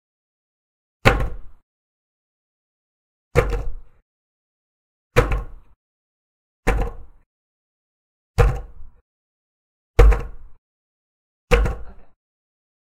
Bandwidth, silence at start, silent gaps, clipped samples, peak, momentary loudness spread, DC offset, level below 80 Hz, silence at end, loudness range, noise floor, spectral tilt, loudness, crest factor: 14 kHz; 1.05 s; 1.62-3.31 s, 4.02-5.10 s, 5.76-6.63 s, 7.26-8.34 s, 9.01-9.94 s, 10.58-11.48 s; under 0.1%; 0 dBFS; 15 LU; under 0.1%; -26 dBFS; 0.8 s; 6 LU; under -90 dBFS; -6 dB/octave; -22 LUFS; 24 dB